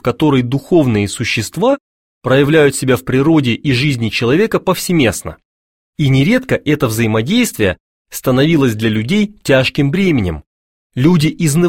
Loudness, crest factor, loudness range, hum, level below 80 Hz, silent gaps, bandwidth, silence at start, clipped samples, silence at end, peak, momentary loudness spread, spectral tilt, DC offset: -14 LUFS; 14 dB; 2 LU; none; -40 dBFS; 1.80-2.21 s, 5.45-5.93 s, 7.80-8.05 s, 10.46-10.90 s; 16.5 kHz; 0.05 s; under 0.1%; 0 s; 0 dBFS; 6 LU; -5.5 dB/octave; 0.2%